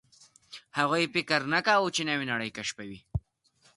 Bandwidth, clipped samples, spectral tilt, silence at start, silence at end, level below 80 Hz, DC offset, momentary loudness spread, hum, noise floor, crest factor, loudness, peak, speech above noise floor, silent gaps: 11.5 kHz; under 0.1%; -3.5 dB/octave; 0.5 s; 0.55 s; -52 dBFS; under 0.1%; 14 LU; none; -66 dBFS; 22 dB; -28 LUFS; -8 dBFS; 38 dB; none